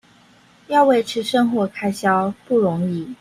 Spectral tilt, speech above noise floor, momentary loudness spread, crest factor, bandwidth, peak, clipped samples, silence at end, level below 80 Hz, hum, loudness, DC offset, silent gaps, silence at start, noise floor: -6 dB/octave; 33 dB; 7 LU; 16 dB; 15.5 kHz; -4 dBFS; under 0.1%; 0.05 s; -60 dBFS; none; -19 LUFS; under 0.1%; none; 0.7 s; -52 dBFS